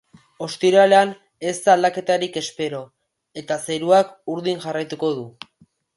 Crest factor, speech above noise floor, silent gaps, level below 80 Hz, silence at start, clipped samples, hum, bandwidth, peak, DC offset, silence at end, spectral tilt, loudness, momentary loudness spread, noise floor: 18 dB; 39 dB; none; -70 dBFS; 0.4 s; under 0.1%; none; 11.5 kHz; -2 dBFS; under 0.1%; 0.65 s; -4 dB/octave; -20 LUFS; 16 LU; -58 dBFS